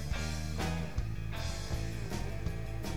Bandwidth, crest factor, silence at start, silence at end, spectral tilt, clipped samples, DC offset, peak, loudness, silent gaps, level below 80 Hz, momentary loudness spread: 19 kHz; 14 dB; 0 s; 0 s; -5 dB/octave; under 0.1%; 0.8%; -22 dBFS; -38 LUFS; none; -40 dBFS; 3 LU